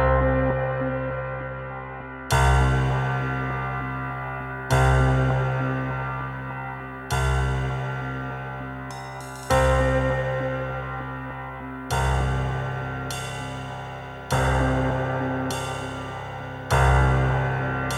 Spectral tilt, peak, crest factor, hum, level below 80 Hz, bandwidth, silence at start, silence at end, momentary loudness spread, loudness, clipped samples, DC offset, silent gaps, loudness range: -6 dB/octave; -8 dBFS; 16 dB; none; -32 dBFS; 13.5 kHz; 0 s; 0 s; 14 LU; -25 LUFS; under 0.1%; under 0.1%; none; 5 LU